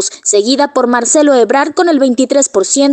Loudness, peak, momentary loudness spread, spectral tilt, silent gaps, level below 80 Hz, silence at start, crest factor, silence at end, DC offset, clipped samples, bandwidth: -10 LUFS; 0 dBFS; 3 LU; -1.5 dB/octave; none; -58 dBFS; 0 s; 10 dB; 0 s; under 0.1%; under 0.1%; 9.4 kHz